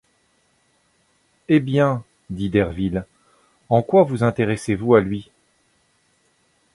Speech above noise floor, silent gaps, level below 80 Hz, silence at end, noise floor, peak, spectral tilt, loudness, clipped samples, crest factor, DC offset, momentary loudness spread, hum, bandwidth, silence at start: 45 dB; none; -48 dBFS; 1.55 s; -64 dBFS; -2 dBFS; -7.5 dB/octave; -20 LUFS; under 0.1%; 20 dB; under 0.1%; 12 LU; none; 11.5 kHz; 1.5 s